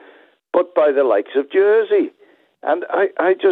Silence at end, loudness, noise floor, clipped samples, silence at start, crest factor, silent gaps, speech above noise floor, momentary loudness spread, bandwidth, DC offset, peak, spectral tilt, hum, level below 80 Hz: 0 s; -17 LUFS; -49 dBFS; under 0.1%; 0.55 s; 14 dB; none; 33 dB; 7 LU; 4.1 kHz; under 0.1%; -4 dBFS; -7.5 dB/octave; none; -84 dBFS